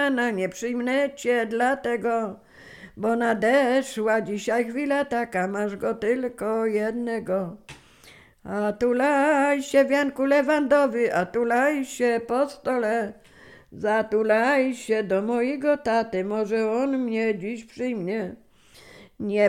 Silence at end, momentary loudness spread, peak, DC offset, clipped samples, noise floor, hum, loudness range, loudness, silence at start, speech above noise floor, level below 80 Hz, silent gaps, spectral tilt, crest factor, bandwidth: 0 s; 9 LU; -8 dBFS; under 0.1%; under 0.1%; -52 dBFS; none; 5 LU; -24 LUFS; 0 s; 28 dB; -62 dBFS; none; -5 dB/octave; 16 dB; 16 kHz